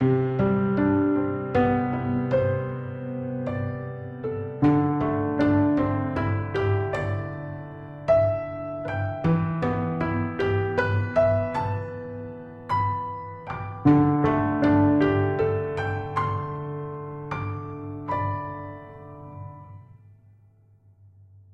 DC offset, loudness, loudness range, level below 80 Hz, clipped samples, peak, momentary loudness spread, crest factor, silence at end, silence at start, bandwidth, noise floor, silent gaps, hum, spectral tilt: under 0.1%; -25 LUFS; 10 LU; -50 dBFS; under 0.1%; -6 dBFS; 14 LU; 18 dB; 1.6 s; 0 s; 6.4 kHz; -57 dBFS; none; none; -9.5 dB/octave